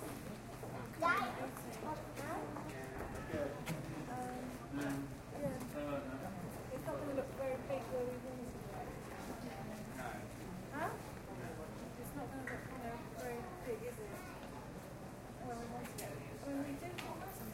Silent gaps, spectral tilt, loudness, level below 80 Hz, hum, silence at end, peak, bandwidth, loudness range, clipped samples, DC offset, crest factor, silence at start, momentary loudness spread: none; -5.5 dB/octave; -45 LUFS; -60 dBFS; none; 0 s; -22 dBFS; 16 kHz; 5 LU; under 0.1%; under 0.1%; 22 dB; 0 s; 7 LU